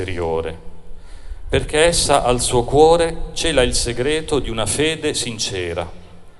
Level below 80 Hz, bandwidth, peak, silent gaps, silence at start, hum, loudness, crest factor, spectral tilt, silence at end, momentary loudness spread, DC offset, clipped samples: -30 dBFS; 12.5 kHz; 0 dBFS; none; 0 s; none; -18 LUFS; 18 dB; -3.5 dB/octave; 0 s; 11 LU; under 0.1%; under 0.1%